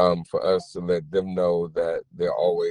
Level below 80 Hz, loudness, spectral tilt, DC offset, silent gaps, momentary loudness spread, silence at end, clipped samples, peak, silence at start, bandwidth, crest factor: -56 dBFS; -25 LUFS; -7 dB/octave; under 0.1%; none; 4 LU; 0 s; under 0.1%; -6 dBFS; 0 s; 10.5 kHz; 18 dB